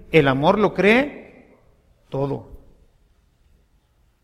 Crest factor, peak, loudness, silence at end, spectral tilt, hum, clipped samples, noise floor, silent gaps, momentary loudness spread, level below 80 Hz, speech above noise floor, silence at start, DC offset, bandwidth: 22 dB; -2 dBFS; -19 LUFS; 1.65 s; -7 dB/octave; none; under 0.1%; -61 dBFS; none; 16 LU; -48 dBFS; 43 dB; 0.1 s; under 0.1%; 13 kHz